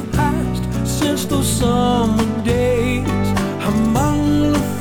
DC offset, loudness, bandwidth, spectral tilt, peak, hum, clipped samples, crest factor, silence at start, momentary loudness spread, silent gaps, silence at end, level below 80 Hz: under 0.1%; -17 LUFS; 19 kHz; -5.5 dB/octave; -6 dBFS; none; under 0.1%; 10 dB; 0 s; 4 LU; none; 0 s; -30 dBFS